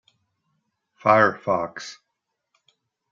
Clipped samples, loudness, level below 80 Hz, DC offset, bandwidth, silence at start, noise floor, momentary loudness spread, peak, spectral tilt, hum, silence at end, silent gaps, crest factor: under 0.1%; -21 LUFS; -72 dBFS; under 0.1%; 7.6 kHz; 1.05 s; -80 dBFS; 19 LU; -2 dBFS; -5.5 dB/octave; none; 1.2 s; none; 22 dB